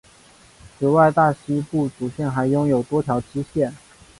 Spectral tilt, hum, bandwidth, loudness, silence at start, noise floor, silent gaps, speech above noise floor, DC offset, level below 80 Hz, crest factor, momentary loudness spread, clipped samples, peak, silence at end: -8 dB/octave; none; 11.5 kHz; -21 LUFS; 0.8 s; -50 dBFS; none; 31 dB; under 0.1%; -52 dBFS; 18 dB; 10 LU; under 0.1%; -4 dBFS; 0.45 s